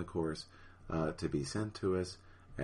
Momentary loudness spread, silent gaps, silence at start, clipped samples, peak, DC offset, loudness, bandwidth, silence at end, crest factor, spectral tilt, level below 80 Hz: 17 LU; none; 0 s; under 0.1%; -22 dBFS; under 0.1%; -38 LUFS; 11.5 kHz; 0 s; 16 dB; -6 dB/octave; -56 dBFS